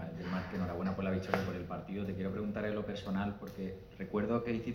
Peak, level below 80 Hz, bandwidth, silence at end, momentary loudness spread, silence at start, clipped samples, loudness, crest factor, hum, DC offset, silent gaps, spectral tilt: -14 dBFS; -58 dBFS; 16 kHz; 0 s; 8 LU; 0 s; under 0.1%; -38 LUFS; 24 dB; none; under 0.1%; none; -8 dB/octave